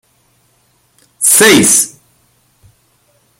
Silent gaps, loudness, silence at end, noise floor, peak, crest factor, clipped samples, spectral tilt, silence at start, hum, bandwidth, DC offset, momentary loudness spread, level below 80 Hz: none; -7 LUFS; 1.5 s; -55 dBFS; 0 dBFS; 14 dB; under 0.1%; -1.5 dB/octave; 1.2 s; none; over 20 kHz; under 0.1%; 9 LU; -54 dBFS